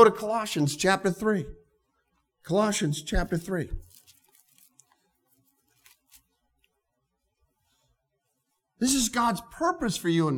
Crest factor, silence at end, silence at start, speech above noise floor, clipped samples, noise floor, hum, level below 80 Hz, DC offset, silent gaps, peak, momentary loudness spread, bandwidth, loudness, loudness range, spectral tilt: 24 dB; 0 s; 0 s; 52 dB; under 0.1%; -79 dBFS; none; -44 dBFS; under 0.1%; none; -4 dBFS; 8 LU; 20 kHz; -27 LUFS; 10 LU; -4.5 dB/octave